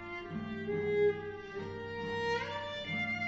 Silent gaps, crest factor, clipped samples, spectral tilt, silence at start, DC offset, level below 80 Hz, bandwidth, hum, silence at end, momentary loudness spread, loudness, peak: none; 14 dB; under 0.1%; -3.5 dB/octave; 0 s; under 0.1%; -62 dBFS; 7.6 kHz; none; 0 s; 11 LU; -36 LUFS; -22 dBFS